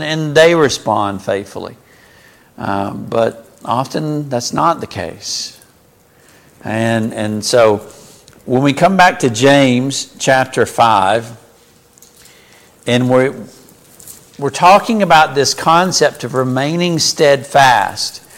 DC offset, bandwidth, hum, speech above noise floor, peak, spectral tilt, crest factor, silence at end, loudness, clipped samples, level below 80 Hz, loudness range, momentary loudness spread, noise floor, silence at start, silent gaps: under 0.1%; 17 kHz; none; 36 dB; 0 dBFS; -4 dB/octave; 14 dB; 0.2 s; -13 LUFS; under 0.1%; -50 dBFS; 8 LU; 13 LU; -49 dBFS; 0 s; none